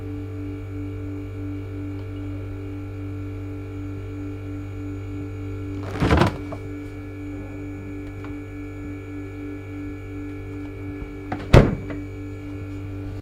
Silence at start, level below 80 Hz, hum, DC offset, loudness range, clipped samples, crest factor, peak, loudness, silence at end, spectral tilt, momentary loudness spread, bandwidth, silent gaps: 0 s; -36 dBFS; none; under 0.1%; 10 LU; under 0.1%; 26 dB; 0 dBFS; -28 LUFS; 0 s; -7.5 dB/octave; 14 LU; 14.5 kHz; none